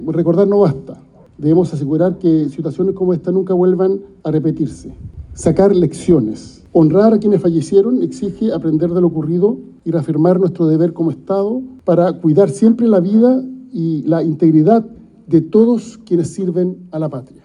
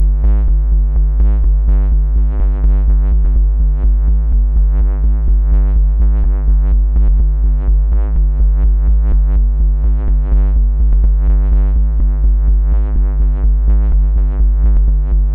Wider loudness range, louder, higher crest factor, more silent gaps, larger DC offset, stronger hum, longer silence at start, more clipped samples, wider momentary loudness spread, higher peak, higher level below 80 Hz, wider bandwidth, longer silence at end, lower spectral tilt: about the same, 2 LU vs 0 LU; about the same, -15 LUFS vs -15 LUFS; first, 14 dB vs 6 dB; neither; second, under 0.1% vs 0.7%; neither; about the same, 0 s vs 0 s; neither; first, 10 LU vs 2 LU; first, 0 dBFS vs -4 dBFS; second, -46 dBFS vs -10 dBFS; first, 11 kHz vs 1.7 kHz; first, 0.2 s vs 0 s; second, -9 dB/octave vs -13.5 dB/octave